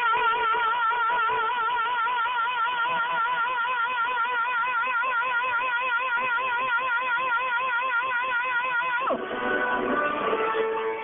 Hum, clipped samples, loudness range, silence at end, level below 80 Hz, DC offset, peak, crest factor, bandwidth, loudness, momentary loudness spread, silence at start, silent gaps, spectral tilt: none; under 0.1%; 1 LU; 0 s; -64 dBFS; under 0.1%; -12 dBFS; 14 dB; 3.9 kHz; -25 LUFS; 2 LU; 0 s; none; 4.5 dB/octave